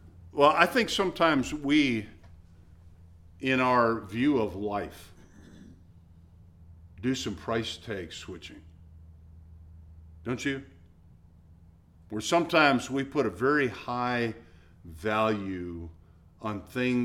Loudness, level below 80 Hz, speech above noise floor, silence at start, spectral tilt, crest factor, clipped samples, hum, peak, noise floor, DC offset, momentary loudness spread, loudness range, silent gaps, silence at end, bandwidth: -28 LUFS; -54 dBFS; 28 dB; 0.05 s; -5 dB/octave; 26 dB; under 0.1%; none; -4 dBFS; -56 dBFS; under 0.1%; 18 LU; 11 LU; none; 0 s; 16 kHz